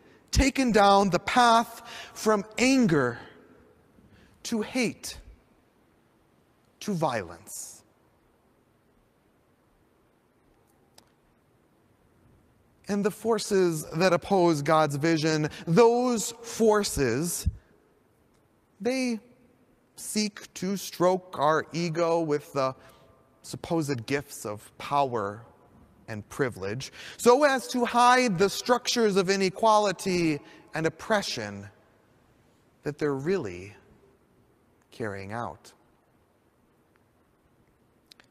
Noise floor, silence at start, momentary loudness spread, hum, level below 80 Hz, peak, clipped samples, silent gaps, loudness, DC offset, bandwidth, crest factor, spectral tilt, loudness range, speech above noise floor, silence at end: -65 dBFS; 0.3 s; 18 LU; none; -48 dBFS; -6 dBFS; under 0.1%; none; -26 LUFS; under 0.1%; 15.5 kHz; 22 dB; -4.5 dB/octave; 13 LU; 40 dB; 2.6 s